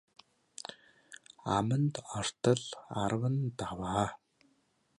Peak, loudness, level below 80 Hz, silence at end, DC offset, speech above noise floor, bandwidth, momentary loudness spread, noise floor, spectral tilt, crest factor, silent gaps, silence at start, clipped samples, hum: -14 dBFS; -33 LUFS; -60 dBFS; 0.85 s; under 0.1%; 41 dB; 11.5 kHz; 18 LU; -73 dBFS; -5.5 dB/octave; 22 dB; none; 0.7 s; under 0.1%; none